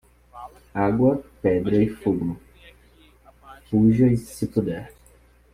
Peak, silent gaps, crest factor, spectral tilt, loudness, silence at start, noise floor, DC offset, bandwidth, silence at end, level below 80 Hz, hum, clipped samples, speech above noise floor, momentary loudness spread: -6 dBFS; none; 18 dB; -8.5 dB/octave; -22 LUFS; 0.35 s; -54 dBFS; under 0.1%; 14.5 kHz; 0.65 s; -48 dBFS; none; under 0.1%; 33 dB; 18 LU